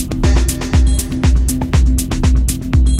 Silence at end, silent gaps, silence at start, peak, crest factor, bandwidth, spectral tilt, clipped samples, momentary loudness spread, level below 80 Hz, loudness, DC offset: 0 s; none; 0 s; 0 dBFS; 12 dB; 16 kHz; -5.5 dB/octave; under 0.1%; 2 LU; -14 dBFS; -15 LUFS; under 0.1%